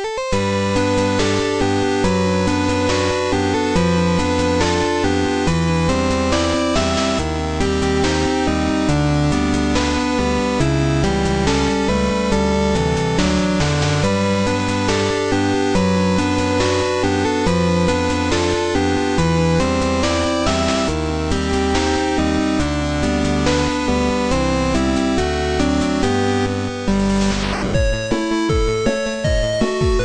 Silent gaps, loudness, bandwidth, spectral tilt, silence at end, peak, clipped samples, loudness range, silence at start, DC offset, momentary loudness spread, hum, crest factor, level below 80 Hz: none; -18 LUFS; 10.5 kHz; -5.5 dB/octave; 0 s; -2 dBFS; under 0.1%; 1 LU; 0 s; under 0.1%; 2 LU; none; 14 dB; -28 dBFS